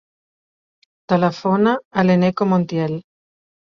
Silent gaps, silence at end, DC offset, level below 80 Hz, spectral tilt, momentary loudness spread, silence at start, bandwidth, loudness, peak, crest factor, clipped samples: 1.85-1.91 s; 0.65 s; under 0.1%; -60 dBFS; -8 dB/octave; 7 LU; 1.1 s; 6.6 kHz; -18 LUFS; -4 dBFS; 16 dB; under 0.1%